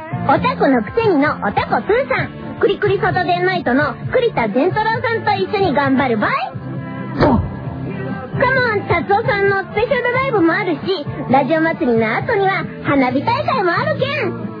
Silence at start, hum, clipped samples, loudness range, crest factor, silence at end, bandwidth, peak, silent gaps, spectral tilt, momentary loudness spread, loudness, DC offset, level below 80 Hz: 0 s; none; under 0.1%; 2 LU; 16 dB; 0 s; 5.2 kHz; 0 dBFS; none; -9 dB/octave; 7 LU; -17 LUFS; under 0.1%; -42 dBFS